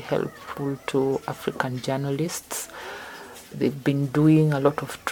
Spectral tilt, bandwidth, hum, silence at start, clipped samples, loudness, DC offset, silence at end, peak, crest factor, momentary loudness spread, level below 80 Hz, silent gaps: -6 dB/octave; 19 kHz; none; 0 s; under 0.1%; -25 LUFS; under 0.1%; 0 s; -6 dBFS; 20 dB; 17 LU; -60 dBFS; none